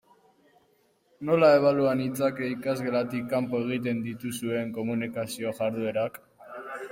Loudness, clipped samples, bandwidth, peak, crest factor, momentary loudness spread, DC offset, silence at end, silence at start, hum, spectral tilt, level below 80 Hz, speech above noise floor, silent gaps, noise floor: -27 LUFS; under 0.1%; 16.5 kHz; -8 dBFS; 20 dB; 14 LU; under 0.1%; 0 s; 1.2 s; none; -6 dB/octave; -70 dBFS; 40 dB; none; -66 dBFS